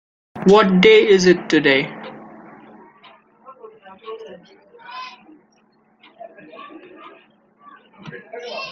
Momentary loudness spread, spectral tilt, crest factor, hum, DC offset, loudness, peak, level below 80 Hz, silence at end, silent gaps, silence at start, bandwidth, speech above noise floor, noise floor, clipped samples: 29 LU; -5.5 dB/octave; 20 dB; none; under 0.1%; -14 LUFS; -2 dBFS; -58 dBFS; 0 s; none; 0.35 s; 7.8 kHz; 45 dB; -58 dBFS; under 0.1%